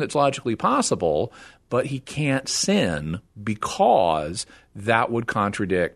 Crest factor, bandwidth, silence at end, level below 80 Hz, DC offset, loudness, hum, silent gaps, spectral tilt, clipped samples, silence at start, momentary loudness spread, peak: 20 dB; 12.5 kHz; 0.05 s; -52 dBFS; under 0.1%; -23 LUFS; none; none; -4.5 dB/octave; under 0.1%; 0 s; 11 LU; -2 dBFS